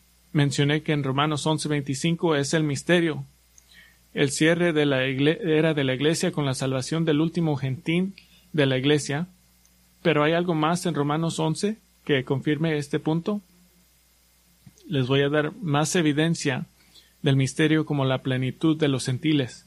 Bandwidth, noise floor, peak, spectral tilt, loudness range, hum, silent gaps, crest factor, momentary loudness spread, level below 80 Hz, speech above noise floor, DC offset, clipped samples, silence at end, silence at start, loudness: 13.5 kHz; -61 dBFS; -6 dBFS; -5.5 dB/octave; 4 LU; none; none; 18 dB; 7 LU; -60 dBFS; 37 dB; under 0.1%; under 0.1%; 0.1 s; 0.35 s; -24 LUFS